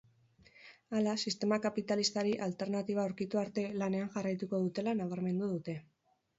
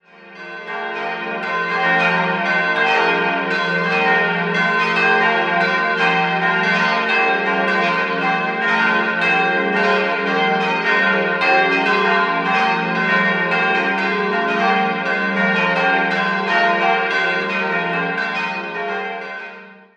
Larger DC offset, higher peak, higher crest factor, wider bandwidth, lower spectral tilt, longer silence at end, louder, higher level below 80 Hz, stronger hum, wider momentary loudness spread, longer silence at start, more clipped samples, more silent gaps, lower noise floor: neither; second, -20 dBFS vs -2 dBFS; about the same, 16 dB vs 16 dB; second, 7.6 kHz vs 9.4 kHz; about the same, -5 dB/octave vs -5 dB/octave; first, 0.6 s vs 0.25 s; second, -35 LUFS vs -17 LUFS; second, -76 dBFS vs -68 dBFS; neither; second, 4 LU vs 8 LU; first, 0.6 s vs 0.2 s; neither; neither; first, -66 dBFS vs -38 dBFS